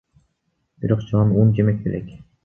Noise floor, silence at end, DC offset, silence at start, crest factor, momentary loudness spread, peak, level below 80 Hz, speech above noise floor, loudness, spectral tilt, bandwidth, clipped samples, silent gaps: -71 dBFS; 0.25 s; under 0.1%; 0.8 s; 18 dB; 14 LU; -4 dBFS; -46 dBFS; 53 dB; -20 LUFS; -11 dB/octave; 3.4 kHz; under 0.1%; none